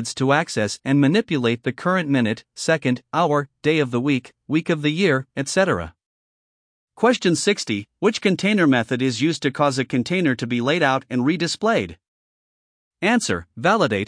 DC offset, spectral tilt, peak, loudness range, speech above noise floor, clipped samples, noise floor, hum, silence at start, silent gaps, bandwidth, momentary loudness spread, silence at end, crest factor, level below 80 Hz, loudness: under 0.1%; -5 dB/octave; -4 dBFS; 2 LU; over 70 dB; under 0.1%; under -90 dBFS; none; 0 s; 6.06-6.87 s, 12.08-12.91 s; 10.5 kHz; 6 LU; 0 s; 18 dB; -58 dBFS; -20 LUFS